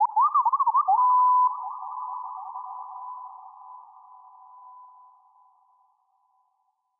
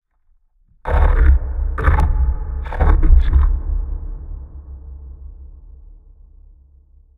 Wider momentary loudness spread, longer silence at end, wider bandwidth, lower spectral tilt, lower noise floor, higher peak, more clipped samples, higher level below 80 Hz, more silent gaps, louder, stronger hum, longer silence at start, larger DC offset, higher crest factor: first, 25 LU vs 22 LU; first, 2.15 s vs 1.25 s; second, 1.5 kHz vs 3.9 kHz; second, 0.5 dB/octave vs -9 dB/octave; first, -74 dBFS vs -57 dBFS; second, -14 dBFS vs 0 dBFS; neither; second, under -90 dBFS vs -18 dBFS; neither; second, -23 LUFS vs -19 LUFS; neither; second, 0 s vs 0.85 s; neither; about the same, 14 dB vs 18 dB